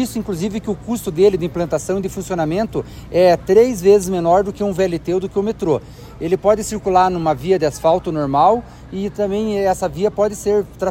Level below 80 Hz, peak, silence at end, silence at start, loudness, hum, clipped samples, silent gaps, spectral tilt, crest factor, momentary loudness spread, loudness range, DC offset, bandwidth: -40 dBFS; -2 dBFS; 0 s; 0 s; -17 LUFS; none; under 0.1%; none; -6 dB/octave; 16 dB; 9 LU; 2 LU; under 0.1%; 16 kHz